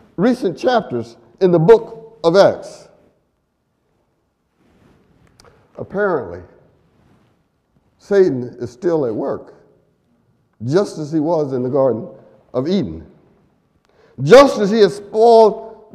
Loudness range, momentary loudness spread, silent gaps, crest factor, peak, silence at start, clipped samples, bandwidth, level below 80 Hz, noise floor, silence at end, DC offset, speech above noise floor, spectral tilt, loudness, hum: 12 LU; 20 LU; none; 18 dB; 0 dBFS; 0.2 s; under 0.1%; 12 kHz; -52 dBFS; -67 dBFS; 0.2 s; under 0.1%; 52 dB; -6.5 dB/octave; -15 LUFS; none